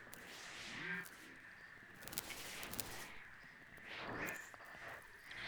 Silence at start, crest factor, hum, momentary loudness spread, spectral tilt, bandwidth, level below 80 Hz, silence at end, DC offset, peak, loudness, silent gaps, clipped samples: 0 s; 36 dB; none; 11 LU; -2 dB/octave; over 20 kHz; -70 dBFS; 0 s; under 0.1%; -14 dBFS; -49 LUFS; none; under 0.1%